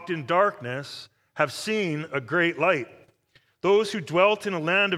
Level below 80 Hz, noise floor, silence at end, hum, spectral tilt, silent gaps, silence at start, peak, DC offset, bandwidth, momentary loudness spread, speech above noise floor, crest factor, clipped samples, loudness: -74 dBFS; -64 dBFS; 0 s; none; -5 dB/octave; none; 0 s; -6 dBFS; under 0.1%; 14.5 kHz; 12 LU; 39 dB; 20 dB; under 0.1%; -24 LUFS